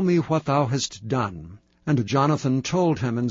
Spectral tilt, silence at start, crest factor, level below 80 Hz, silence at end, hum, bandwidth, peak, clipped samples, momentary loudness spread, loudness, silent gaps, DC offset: -6 dB/octave; 0 s; 14 dB; -54 dBFS; 0 s; none; 7.8 kHz; -8 dBFS; under 0.1%; 6 LU; -23 LUFS; none; under 0.1%